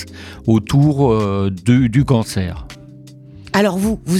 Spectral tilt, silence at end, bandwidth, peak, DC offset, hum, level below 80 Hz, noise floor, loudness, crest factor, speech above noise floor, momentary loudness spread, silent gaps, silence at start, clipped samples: -7 dB/octave; 0 s; 14 kHz; 0 dBFS; under 0.1%; none; -38 dBFS; -39 dBFS; -16 LUFS; 16 dB; 23 dB; 12 LU; none; 0 s; under 0.1%